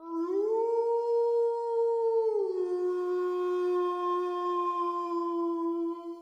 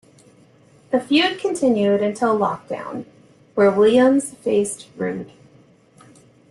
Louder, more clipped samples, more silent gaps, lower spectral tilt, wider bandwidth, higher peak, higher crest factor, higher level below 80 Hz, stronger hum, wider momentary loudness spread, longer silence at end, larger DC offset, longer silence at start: second, -30 LUFS vs -19 LUFS; neither; neither; about the same, -4.5 dB/octave vs -4.5 dB/octave; second, 7.6 kHz vs 12.5 kHz; second, -20 dBFS vs -4 dBFS; second, 10 dB vs 16 dB; second, -88 dBFS vs -64 dBFS; neither; second, 4 LU vs 15 LU; second, 0 s vs 1.25 s; neither; second, 0 s vs 0.9 s